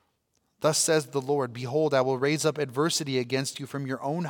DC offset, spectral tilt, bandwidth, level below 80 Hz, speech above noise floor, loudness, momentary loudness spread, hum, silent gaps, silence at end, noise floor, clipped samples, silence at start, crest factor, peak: under 0.1%; -4 dB/octave; 18 kHz; -76 dBFS; 47 dB; -27 LUFS; 8 LU; none; none; 0 s; -74 dBFS; under 0.1%; 0.6 s; 18 dB; -10 dBFS